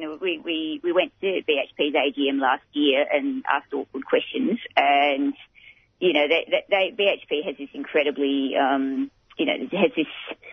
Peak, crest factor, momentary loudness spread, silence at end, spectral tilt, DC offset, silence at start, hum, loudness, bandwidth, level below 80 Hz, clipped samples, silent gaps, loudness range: -4 dBFS; 20 dB; 8 LU; 0 s; -6.5 dB/octave; under 0.1%; 0 s; none; -23 LUFS; 6 kHz; -70 dBFS; under 0.1%; none; 2 LU